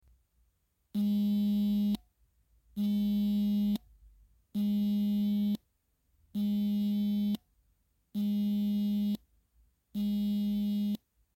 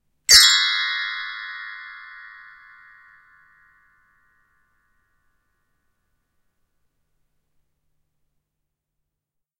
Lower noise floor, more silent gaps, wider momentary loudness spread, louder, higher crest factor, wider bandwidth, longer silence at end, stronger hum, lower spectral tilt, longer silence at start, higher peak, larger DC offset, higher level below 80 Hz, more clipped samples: second, -75 dBFS vs -82 dBFS; neither; second, 10 LU vs 28 LU; second, -32 LUFS vs -14 LUFS; second, 14 dB vs 26 dB; about the same, 16 kHz vs 16 kHz; second, 0.4 s vs 7.4 s; neither; first, -8 dB/octave vs 4 dB/octave; first, 0.95 s vs 0.3 s; second, -18 dBFS vs 0 dBFS; neither; about the same, -62 dBFS vs -58 dBFS; neither